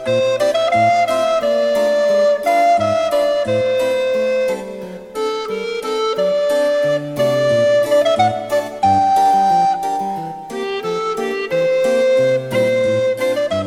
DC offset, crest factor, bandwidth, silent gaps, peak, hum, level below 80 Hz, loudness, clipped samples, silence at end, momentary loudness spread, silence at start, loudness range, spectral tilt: under 0.1%; 12 dB; 16 kHz; none; -4 dBFS; none; -54 dBFS; -16 LUFS; under 0.1%; 0 s; 9 LU; 0 s; 4 LU; -4.5 dB/octave